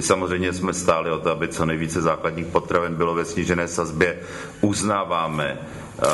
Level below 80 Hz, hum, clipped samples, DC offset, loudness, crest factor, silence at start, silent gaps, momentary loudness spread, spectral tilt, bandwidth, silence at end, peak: -46 dBFS; none; under 0.1%; under 0.1%; -23 LUFS; 20 dB; 0 s; none; 5 LU; -4.5 dB/octave; 11.5 kHz; 0 s; -2 dBFS